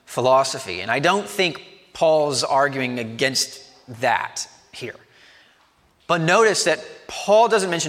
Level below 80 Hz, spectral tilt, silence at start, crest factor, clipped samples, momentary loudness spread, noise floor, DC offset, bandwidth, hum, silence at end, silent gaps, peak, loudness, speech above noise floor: -66 dBFS; -3 dB/octave; 0.1 s; 18 dB; under 0.1%; 18 LU; -59 dBFS; under 0.1%; 16 kHz; none; 0 s; none; -2 dBFS; -20 LUFS; 39 dB